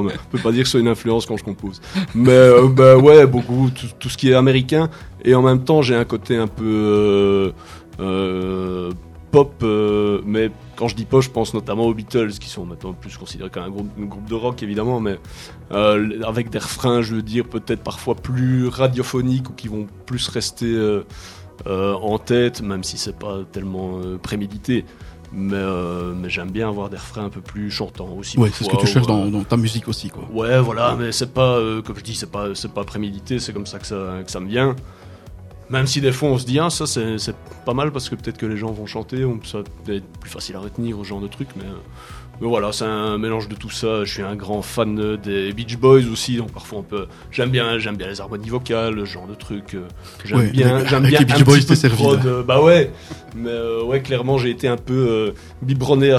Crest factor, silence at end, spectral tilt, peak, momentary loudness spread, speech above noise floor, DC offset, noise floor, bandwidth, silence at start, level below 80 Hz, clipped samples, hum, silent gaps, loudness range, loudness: 18 dB; 0 s; -6 dB/octave; 0 dBFS; 16 LU; 20 dB; under 0.1%; -38 dBFS; 14 kHz; 0 s; -44 dBFS; under 0.1%; none; none; 13 LU; -18 LUFS